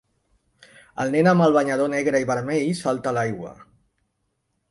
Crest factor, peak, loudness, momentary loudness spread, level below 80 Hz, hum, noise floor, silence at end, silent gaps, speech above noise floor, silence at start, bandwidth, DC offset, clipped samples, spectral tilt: 18 dB; -6 dBFS; -21 LUFS; 13 LU; -62 dBFS; none; -74 dBFS; 1.1 s; none; 53 dB; 0.95 s; 11.5 kHz; under 0.1%; under 0.1%; -6.5 dB/octave